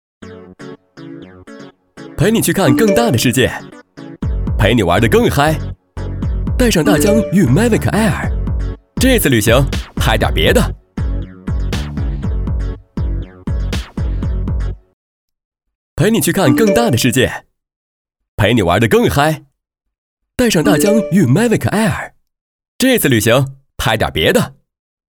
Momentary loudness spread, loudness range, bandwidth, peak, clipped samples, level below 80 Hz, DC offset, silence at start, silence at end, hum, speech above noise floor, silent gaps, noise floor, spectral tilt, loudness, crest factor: 15 LU; 8 LU; over 20 kHz; 0 dBFS; under 0.1%; -24 dBFS; under 0.1%; 0.2 s; 0.55 s; none; 25 dB; 14.93-15.28 s, 15.45-15.52 s, 15.75-15.97 s, 17.76-18.05 s, 18.28-18.38 s, 19.98-20.17 s, 22.41-22.59 s, 22.68-22.79 s; -37 dBFS; -5 dB/octave; -14 LUFS; 14 dB